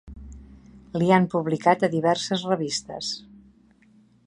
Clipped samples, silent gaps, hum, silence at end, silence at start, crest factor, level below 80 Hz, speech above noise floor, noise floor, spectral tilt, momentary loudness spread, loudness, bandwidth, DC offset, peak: under 0.1%; none; none; 1.1 s; 0.05 s; 22 dB; -52 dBFS; 35 dB; -57 dBFS; -5 dB/octave; 17 LU; -23 LUFS; 11 kHz; under 0.1%; -4 dBFS